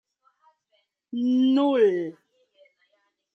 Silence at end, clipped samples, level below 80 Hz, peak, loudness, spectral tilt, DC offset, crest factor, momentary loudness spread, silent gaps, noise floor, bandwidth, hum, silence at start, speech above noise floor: 1.25 s; under 0.1%; -82 dBFS; -10 dBFS; -23 LUFS; -7 dB/octave; under 0.1%; 16 dB; 15 LU; none; -72 dBFS; 6.2 kHz; none; 1.15 s; 50 dB